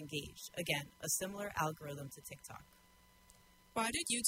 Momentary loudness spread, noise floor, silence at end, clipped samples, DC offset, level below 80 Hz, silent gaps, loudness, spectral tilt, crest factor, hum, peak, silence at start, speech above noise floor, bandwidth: 14 LU; -66 dBFS; 0 s; under 0.1%; under 0.1%; -66 dBFS; none; -40 LUFS; -2.5 dB/octave; 26 dB; none; -16 dBFS; 0 s; 26 dB; 16 kHz